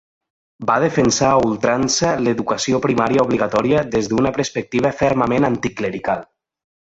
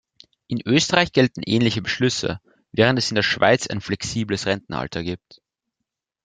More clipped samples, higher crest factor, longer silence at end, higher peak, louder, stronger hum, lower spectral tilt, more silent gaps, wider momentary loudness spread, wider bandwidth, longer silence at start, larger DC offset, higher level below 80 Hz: neither; second, 16 dB vs 22 dB; second, 0.7 s vs 1.1 s; about the same, -2 dBFS vs 0 dBFS; first, -18 LUFS vs -21 LUFS; neither; about the same, -4.5 dB/octave vs -4.5 dB/octave; neither; second, 7 LU vs 12 LU; second, 8.2 kHz vs 9.6 kHz; about the same, 0.6 s vs 0.5 s; neither; first, -46 dBFS vs -52 dBFS